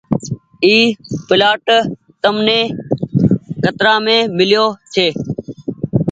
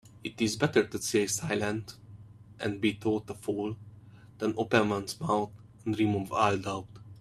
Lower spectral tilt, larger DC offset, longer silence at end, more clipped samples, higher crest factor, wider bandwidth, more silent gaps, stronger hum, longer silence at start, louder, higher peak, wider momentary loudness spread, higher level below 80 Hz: about the same, -5.5 dB/octave vs -4.5 dB/octave; neither; about the same, 0 s vs 0 s; neither; second, 14 dB vs 22 dB; second, 9 kHz vs 15 kHz; neither; neither; about the same, 0.1 s vs 0.05 s; first, -14 LUFS vs -30 LUFS; first, 0 dBFS vs -8 dBFS; about the same, 13 LU vs 13 LU; first, -46 dBFS vs -62 dBFS